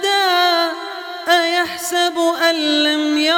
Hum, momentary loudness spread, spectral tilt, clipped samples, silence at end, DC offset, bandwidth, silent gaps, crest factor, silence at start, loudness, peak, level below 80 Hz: none; 8 LU; -0.5 dB/octave; under 0.1%; 0 s; under 0.1%; 19 kHz; none; 14 dB; 0 s; -16 LUFS; -2 dBFS; -68 dBFS